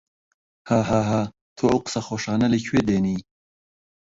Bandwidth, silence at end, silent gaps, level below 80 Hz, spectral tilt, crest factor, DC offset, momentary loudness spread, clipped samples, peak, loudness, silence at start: 8 kHz; 0.85 s; 1.41-1.56 s; -50 dBFS; -6 dB/octave; 18 dB; under 0.1%; 7 LU; under 0.1%; -6 dBFS; -23 LUFS; 0.65 s